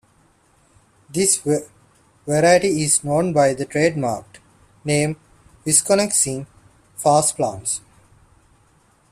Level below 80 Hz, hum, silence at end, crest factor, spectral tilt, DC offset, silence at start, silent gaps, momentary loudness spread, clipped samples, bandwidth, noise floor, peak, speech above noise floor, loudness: -56 dBFS; none; 1.35 s; 20 dB; -3.5 dB/octave; under 0.1%; 1.1 s; none; 16 LU; under 0.1%; 14.5 kHz; -58 dBFS; 0 dBFS; 39 dB; -18 LUFS